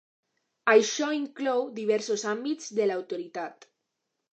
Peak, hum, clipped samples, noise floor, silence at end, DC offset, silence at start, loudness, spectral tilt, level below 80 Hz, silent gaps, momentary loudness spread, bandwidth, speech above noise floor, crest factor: -8 dBFS; none; under 0.1%; -82 dBFS; 0.8 s; under 0.1%; 0.65 s; -27 LUFS; -3 dB/octave; -86 dBFS; none; 14 LU; 8.6 kHz; 55 dB; 22 dB